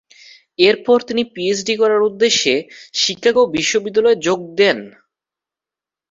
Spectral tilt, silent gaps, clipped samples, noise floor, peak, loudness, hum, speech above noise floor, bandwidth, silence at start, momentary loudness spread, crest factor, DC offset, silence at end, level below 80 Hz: -2.5 dB/octave; none; under 0.1%; -88 dBFS; -2 dBFS; -16 LUFS; none; 72 dB; 7.8 kHz; 0.6 s; 6 LU; 16 dB; under 0.1%; 1.25 s; -60 dBFS